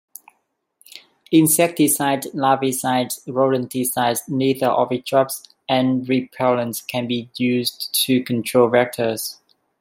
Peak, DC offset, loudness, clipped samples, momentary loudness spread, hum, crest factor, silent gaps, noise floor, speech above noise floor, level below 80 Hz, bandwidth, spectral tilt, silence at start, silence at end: -2 dBFS; under 0.1%; -19 LUFS; under 0.1%; 8 LU; none; 18 dB; none; -70 dBFS; 51 dB; -66 dBFS; 16.5 kHz; -4 dB/octave; 0.95 s; 0.45 s